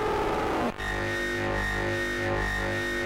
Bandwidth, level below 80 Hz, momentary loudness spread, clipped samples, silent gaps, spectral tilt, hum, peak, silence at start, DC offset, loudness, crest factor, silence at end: 16 kHz; -40 dBFS; 2 LU; under 0.1%; none; -5 dB/octave; 50 Hz at -40 dBFS; -18 dBFS; 0 s; under 0.1%; -28 LUFS; 10 dB; 0 s